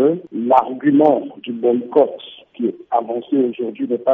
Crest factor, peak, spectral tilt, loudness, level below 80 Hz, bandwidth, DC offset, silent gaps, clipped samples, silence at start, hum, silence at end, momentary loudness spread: 16 dB; -2 dBFS; -5.5 dB/octave; -18 LUFS; -68 dBFS; 3.8 kHz; under 0.1%; none; under 0.1%; 0 s; none; 0 s; 10 LU